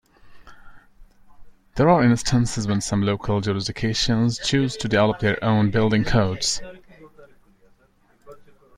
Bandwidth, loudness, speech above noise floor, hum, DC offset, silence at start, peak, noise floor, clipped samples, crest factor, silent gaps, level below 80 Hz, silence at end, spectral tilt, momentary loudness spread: 12 kHz; -21 LUFS; 39 dB; none; under 0.1%; 0.25 s; -4 dBFS; -59 dBFS; under 0.1%; 18 dB; none; -42 dBFS; 0.4 s; -5 dB/octave; 6 LU